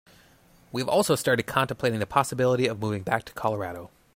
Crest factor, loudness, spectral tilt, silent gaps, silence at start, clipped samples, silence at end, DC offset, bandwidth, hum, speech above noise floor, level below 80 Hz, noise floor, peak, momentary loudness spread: 20 dB; -26 LUFS; -5 dB/octave; none; 0.75 s; under 0.1%; 0.3 s; under 0.1%; 16.5 kHz; none; 32 dB; -60 dBFS; -57 dBFS; -6 dBFS; 9 LU